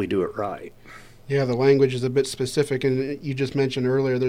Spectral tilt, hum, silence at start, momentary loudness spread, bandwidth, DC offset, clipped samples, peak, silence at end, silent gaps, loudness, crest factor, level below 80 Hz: -6.5 dB/octave; none; 0 s; 10 LU; 14.5 kHz; under 0.1%; under 0.1%; -6 dBFS; 0 s; none; -23 LUFS; 16 dB; -54 dBFS